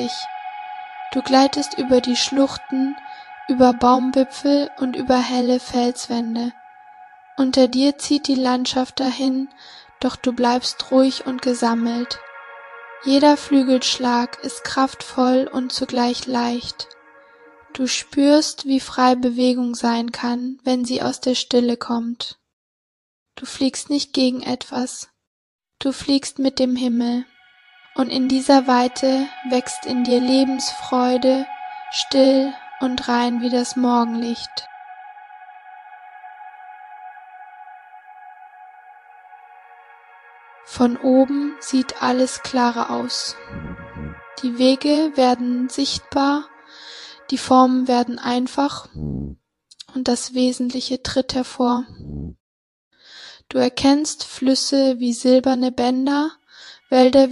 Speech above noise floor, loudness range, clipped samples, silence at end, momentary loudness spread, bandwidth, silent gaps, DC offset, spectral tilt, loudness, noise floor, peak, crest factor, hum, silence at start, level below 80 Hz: 33 dB; 5 LU; under 0.1%; 0 s; 18 LU; 11.5 kHz; 22.53-23.26 s, 25.27-25.59 s, 52.40-52.91 s; under 0.1%; -3.5 dB/octave; -19 LUFS; -52 dBFS; -2 dBFS; 18 dB; none; 0 s; -52 dBFS